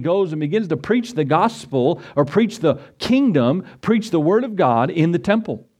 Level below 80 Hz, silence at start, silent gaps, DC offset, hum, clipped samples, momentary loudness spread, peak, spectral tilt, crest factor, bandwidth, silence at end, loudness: -56 dBFS; 0 s; none; under 0.1%; none; under 0.1%; 4 LU; -2 dBFS; -7 dB/octave; 16 dB; 12.5 kHz; 0.2 s; -19 LUFS